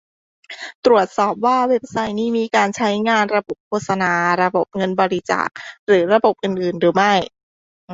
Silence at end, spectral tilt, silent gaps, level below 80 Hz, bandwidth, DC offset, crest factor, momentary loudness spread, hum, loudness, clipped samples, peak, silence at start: 0 s; -5 dB/octave; 0.75-0.83 s, 3.60-3.71 s, 5.79-5.87 s, 7.43-7.88 s; -60 dBFS; 8 kHz; under 0.1%; 18 dB; 10 LU; none; -18 LUFS; under 0.1%; 0 dBFS; 0.5 s